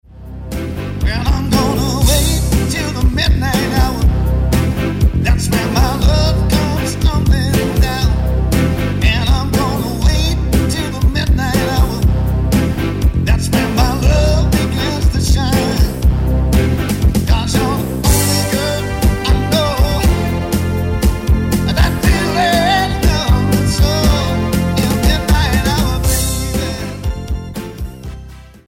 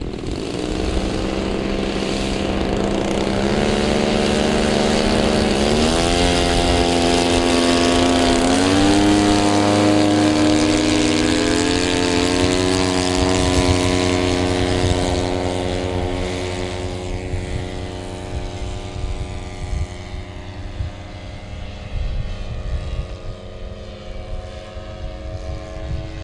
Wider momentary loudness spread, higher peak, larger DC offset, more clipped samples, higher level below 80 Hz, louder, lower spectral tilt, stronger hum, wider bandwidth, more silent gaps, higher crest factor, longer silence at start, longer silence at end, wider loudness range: second, 5 LU vs 17 LU; second, -4 dBFS vs 0 dBFS; neither; neither; first, -18 dBFS vs -30 dBFS; first, -15 LUFS vs -18 LUFS; about the same, -5.5 dB/octave vs -4.5 dB/octave; neither; first, 16.5 kHz vs 11.5 kHz; neither; second, 10 dB vs 18 dB; about the same, 0.1 s vs 0 s; first, 0.2 s vs 0 s; second, 2 LU vs 15 LU